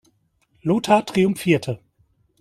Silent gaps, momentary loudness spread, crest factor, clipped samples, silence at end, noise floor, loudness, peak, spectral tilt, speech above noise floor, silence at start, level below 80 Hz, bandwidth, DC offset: none; 13 LU; 20 dB; under 0.1%; 0.65 s; -64 dBFS; -20 LUFS; -2 dBFS; -6 dB/octave; 45 dB; 0.65 s; -58 dBFS; 14.5 kHz; under 0.1%